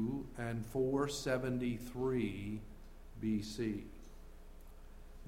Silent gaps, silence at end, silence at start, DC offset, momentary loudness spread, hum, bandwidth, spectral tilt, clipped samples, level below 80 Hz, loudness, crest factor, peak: none; 0 s; 0 s; under 0.1%; 23 LU; none; 16.5 kHz; -6 dB/octave; under 0.1%; -52 dBFS; -39 LUFS; 18 dB; -22 dBFS